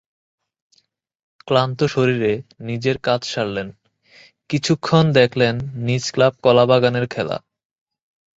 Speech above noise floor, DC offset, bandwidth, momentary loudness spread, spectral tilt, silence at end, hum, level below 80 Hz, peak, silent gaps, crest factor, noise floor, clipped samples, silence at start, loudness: 45 dB; under 0.1%; 8 kHz; 11 LU; -6 dB/octave; 1 s; none; -54 dBFS; -2 dBFS; none; 18 dB; -63 dBFS; under 0.1%; 1.45 s; -19 LUFS